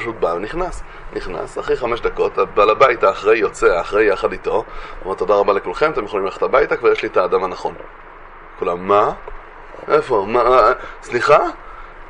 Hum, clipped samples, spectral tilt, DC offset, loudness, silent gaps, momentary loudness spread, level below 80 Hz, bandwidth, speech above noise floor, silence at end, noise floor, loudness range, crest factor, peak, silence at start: none; under 0.1%; -5 dB/octave; under 0.1%; -17 LUFS; none; 17 LU; -38 dBFS; 10.5 kHz; 21 dB; 0 s; -38 dBFS; 4 LU; 18 dB; 0 dBFS; 0 s